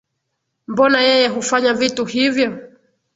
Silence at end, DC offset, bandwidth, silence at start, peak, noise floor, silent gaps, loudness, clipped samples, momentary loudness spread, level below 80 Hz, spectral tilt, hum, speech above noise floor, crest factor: 0.5 s; under 0.1%; 8 kHz; 0.7 s; 0 dBFS; -74 dBFS; none; -16 LUFS; under 0.1%; 9 LU; -60 dBFS; -3 dB/octave; none; 58 dB; 18 dB